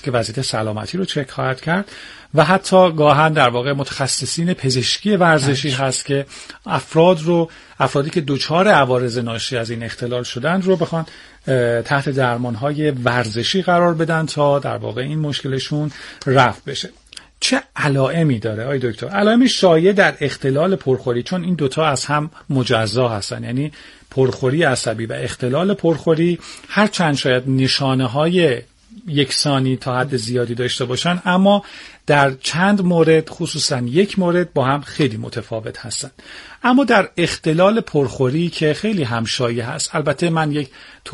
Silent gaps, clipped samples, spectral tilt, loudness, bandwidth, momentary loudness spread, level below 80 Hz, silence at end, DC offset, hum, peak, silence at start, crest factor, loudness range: none; under 0.1%; -5 dB/octave; -17 LUFS; 11.5 kHz; 11 LU; -52 dBFS; 0 s; under 0.1%; none; 0 dBFS; 0.05 s; 18 dB; 4 LU